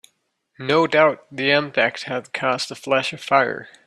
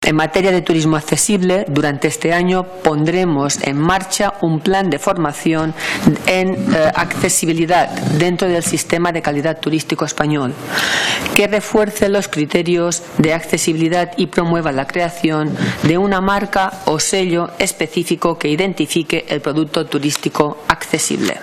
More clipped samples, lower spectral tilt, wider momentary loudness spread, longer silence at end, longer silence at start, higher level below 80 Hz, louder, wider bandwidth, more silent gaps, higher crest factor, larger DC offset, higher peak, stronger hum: neither; about the same, -4.5 dB/octave vs -4.5 dB/octave; first, 8 LU vs 4 LU; first, 0.2 s vs 0 s; first, 0.6 s vs 0 s; second, -68 dBFS vs -42 dBFS; second, -20 LUFS vs -16 LUFS; second, 12.5 kHz vs 16.5 kHz; neither; about the same, 18 dB vs 16 dB; neither; about the same, -2 dBFS vs 0 dBFS; neither